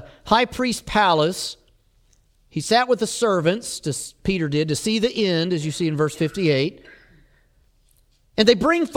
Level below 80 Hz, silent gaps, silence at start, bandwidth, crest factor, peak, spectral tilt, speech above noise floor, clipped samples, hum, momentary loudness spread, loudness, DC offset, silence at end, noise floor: -48 dBFS; none; 0 s; 16.5 kHz; 20 dB; -2 dBFS; -4.5 dB/octave; 39 dB; under 0.1%; none; 10 LU; -21 LUFS; under 0.1%; 0 s; -59 dBFS